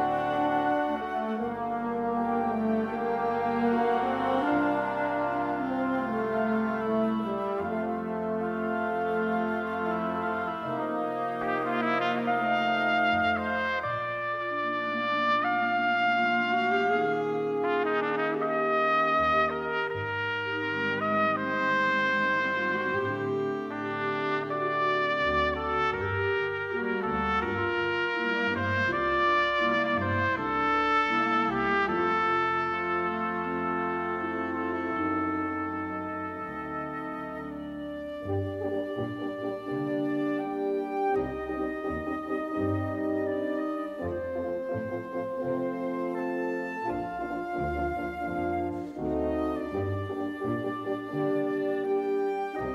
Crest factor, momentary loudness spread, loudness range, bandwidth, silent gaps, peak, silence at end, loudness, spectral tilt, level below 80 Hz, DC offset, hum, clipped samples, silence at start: 16 dB; 8 LU; 6 LU; 12.5 kHz; none; -14 dBFS; 0 s; -28 LUFS; -7 dB/octave; -54 dBFS; under 0.1%; none; under 0.1%; 0 s